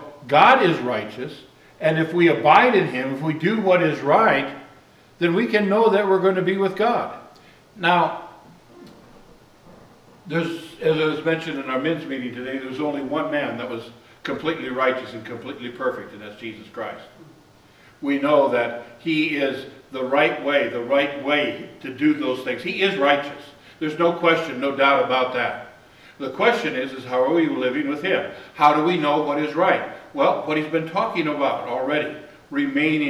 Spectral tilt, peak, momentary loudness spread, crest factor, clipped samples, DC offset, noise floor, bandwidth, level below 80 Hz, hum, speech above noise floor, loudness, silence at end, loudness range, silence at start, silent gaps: -6.5 dB/octave; -2 dBFS; 16 LU; 20 dB; under 0.1%; under 0.1%; -51 dBFS; 13.5 kHz; -64 dBFS; none; 31 dB; -21 LUFS; 0 s; 8 LU; 0 s; none